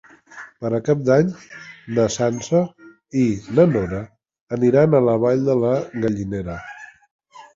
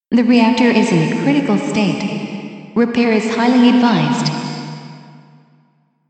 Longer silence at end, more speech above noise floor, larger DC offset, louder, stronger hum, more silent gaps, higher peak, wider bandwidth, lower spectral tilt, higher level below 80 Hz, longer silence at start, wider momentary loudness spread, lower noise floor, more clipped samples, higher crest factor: second, 0.15 s vs 1.1 s; second, 23 dB vs 44 dB; neither; second, -20 LUFS vs -15 LUFS; neither; first, 4.41-4.47 s, 7.11-7.19 s vs none; about the same, -2 dBFS vs 0 dBFS; second, 7.8 kHz vs 8.8 kHz; about the same, -7 dB/octave vs -6 dB/octave; first, -48 dBFS vs -60 dBFS; first, 0.35 s vs 0.1 s; first, 21 LU vs 15 LU; second, -42 dBFS vs -58 dBFS; neither; about the same, 18 dB vs 14 dB